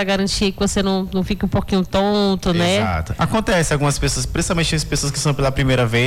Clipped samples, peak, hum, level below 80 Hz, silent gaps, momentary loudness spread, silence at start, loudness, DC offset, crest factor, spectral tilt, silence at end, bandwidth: under 0.1%; -8 dBFS; none; -30 dBFS; none; 4 LU; 0 s; -18 LUFS; under 0.1%; 10 dB; -4.5 dB/octave; 0 s; 16 kHz